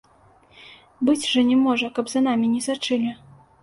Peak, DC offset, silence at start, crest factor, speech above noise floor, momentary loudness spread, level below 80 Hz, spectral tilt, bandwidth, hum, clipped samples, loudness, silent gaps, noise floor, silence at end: -8 dBFS; under 0.1%; 0.65 s; 14 dB; 34 dB; 7 LU; -64 dBFS; -3.5 dB/octave; 11.5 kHz; none; under 0.1%; -21 LUFS; none; -55 dBFS; 0.45 s